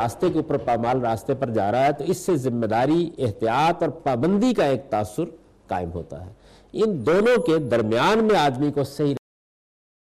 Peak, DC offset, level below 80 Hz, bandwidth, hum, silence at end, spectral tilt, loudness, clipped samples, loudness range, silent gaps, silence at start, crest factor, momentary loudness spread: -12 dBFS; under 0.1%; -52 dBFS; 14.5 kHz; none; 0.85 s; -6.5 dB/octave; -22 LUFS; under 0.1%; 3 LU; none; 0 s; 10 dB; 11 LU